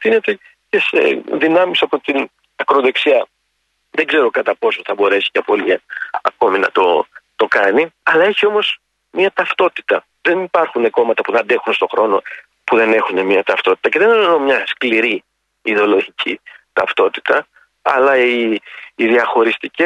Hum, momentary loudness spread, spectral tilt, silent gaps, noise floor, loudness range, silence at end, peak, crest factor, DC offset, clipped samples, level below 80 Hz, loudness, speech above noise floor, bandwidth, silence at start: none; 9 LU; -5 dB/octave; none; -67 dBFS; 2 LU; 0 s; -2 dBFS; 14 dB; under 0.1%; under 0.1%; -66 dBFS; -15 LUFS; 52 dB; 9 kHz; 0 s